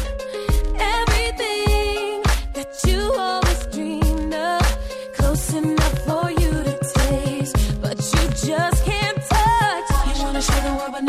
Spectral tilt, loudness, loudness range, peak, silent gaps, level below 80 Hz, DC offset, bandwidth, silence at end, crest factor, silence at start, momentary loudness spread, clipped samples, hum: -4.5 dB/octave; -21 LUFS; 2 LU; -4 dBFS; none; -24 dBFS; under 0.1%; 15.5 kHz; 0 s; 14 dB; 0 s; 4 LU; under 0.1%; none